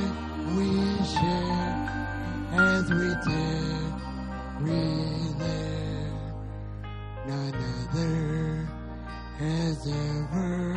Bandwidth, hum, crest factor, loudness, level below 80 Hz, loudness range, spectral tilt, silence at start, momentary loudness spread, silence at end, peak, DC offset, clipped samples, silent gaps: 10 kHz; none; 18 dB; -29 LUFS; -40 dBFS; 6 LU; -6.5 dB/octave; 0 s; 12 LU; 0 s; -10 dBFS; under 0.1%; under 0.1%; none